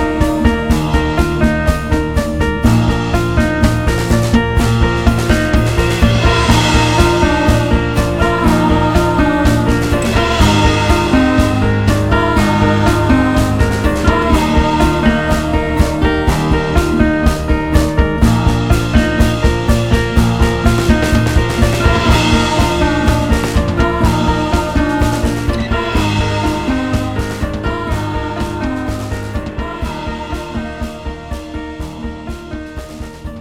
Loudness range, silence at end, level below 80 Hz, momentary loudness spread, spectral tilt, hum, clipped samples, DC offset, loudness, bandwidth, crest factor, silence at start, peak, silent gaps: 8 LU; 0 s; -18 dBFS; 11 LU; -6 dB/octave; none; under 0.1%; under 0.1%; -14 LUFS; 16 kHz; 12 dB; 0 s; 0 dBFS; none